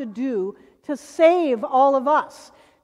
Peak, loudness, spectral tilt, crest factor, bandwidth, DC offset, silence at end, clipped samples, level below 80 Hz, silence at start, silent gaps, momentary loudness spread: -4 dBFS; -19 LUFS; -5 dB/octave; 16 dB; 12 kHz; under 0.1%; 0.45 s; under 0.1%; -70 dBFS; 0 s; none; 15 LU